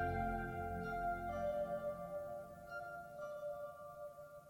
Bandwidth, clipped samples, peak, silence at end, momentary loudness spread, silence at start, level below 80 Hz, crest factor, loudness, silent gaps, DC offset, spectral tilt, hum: 17 kHz; under 0.1%; -28 dBFS; 0 s; 10 LU; 0 s; -58 dBFS; 16 dB; -45 LUFS; none; under 0.1%; -7.5 dB/octave; none